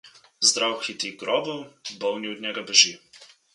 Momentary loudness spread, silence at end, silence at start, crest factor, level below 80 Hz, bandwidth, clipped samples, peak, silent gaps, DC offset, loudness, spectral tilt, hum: 15 LU; 0.3 s; 0.05 s; 24 dB; -78 dBFS; 11.5 kHz; under 0.1%; -2 dBFS; none; under 0.1%; -22 LUFS; 0 dB/octave; none